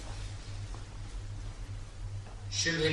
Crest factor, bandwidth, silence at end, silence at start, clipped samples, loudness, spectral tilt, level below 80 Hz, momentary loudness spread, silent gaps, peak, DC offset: 20 dB; 11.5 kHz; 0 s; 0 s; under 0.1%; -38 LUFS; -3.5 dB/octave; -44 dBFS; 14 LU; none; -16 dBFS; under 0.1%